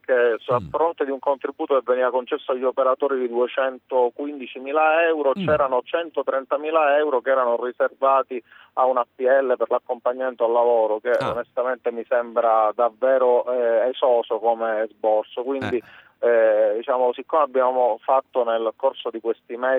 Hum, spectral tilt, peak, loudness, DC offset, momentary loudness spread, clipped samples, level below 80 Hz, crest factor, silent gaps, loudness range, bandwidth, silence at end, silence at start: none; -7 dB/octave; -6 dBFS; -21 LUFS; under 0.1%; 7 LU; under 0.1%; -64 dBFS; 16 dB; none; 2 LU; 4.9 kHz; 0 s; 0.1 s